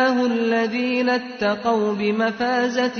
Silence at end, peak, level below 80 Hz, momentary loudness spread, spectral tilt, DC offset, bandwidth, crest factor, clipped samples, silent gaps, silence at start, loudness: 0 s; -8 dBFS; -62 dBFS; 2 LU; -5 dB/octave; under 0.1%; 6.6 kHz; 12 dB; under 0.1%; none; 0 s; -21 LUFS